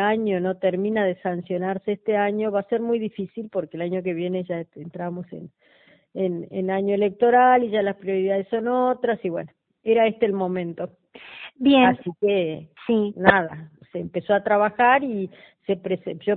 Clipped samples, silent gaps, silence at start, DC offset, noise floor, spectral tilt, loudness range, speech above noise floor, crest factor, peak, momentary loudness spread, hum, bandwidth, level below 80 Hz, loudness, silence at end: under 0.1%; none; 0 s; under 0.1%; -42 dBFS; -10 dB/octave; 7 LU; 20 dB; 22 dB; 0 dBFS; 16 LU; none; 4.3 kHz; -62 dBFS; -23 LUFS; 0 s